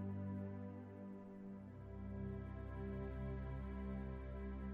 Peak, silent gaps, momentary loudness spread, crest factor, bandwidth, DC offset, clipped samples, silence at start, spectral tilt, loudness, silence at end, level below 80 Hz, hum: -36 dBFS; none; 7 LU; 12 dB; 4.1 kHz; under 0.1%; under 0.1%; 0 s; -10.5 dB/octave; -49 LUFS; 0 s; -52 dBFS; none